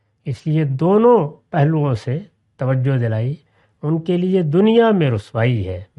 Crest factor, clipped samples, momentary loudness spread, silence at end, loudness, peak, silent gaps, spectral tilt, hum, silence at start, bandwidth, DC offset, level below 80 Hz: 14 dB; under 0.1%; 13 LU; 0.15 s; -17 LUFS; -2 dBFS; none; -9 dB/octave; none; 0.25 s; 8.2 kHz; under 0.1%; -56 dBFS